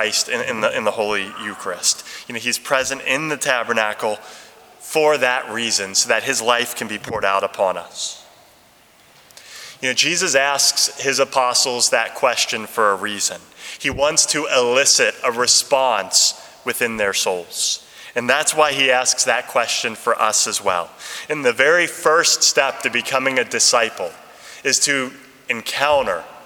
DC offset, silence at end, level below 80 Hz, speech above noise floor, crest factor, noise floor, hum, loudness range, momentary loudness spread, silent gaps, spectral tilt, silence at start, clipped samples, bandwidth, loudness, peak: under 0.1%; 0 s; -58 dBFS; 32 dB; 20 dB; -51 dBFS; none; 5 LU; 11 LU; none; -0.5 dB/octave; 0 s; under 0.1%; over 20 kHz; -17 LUFS; 0 dBFS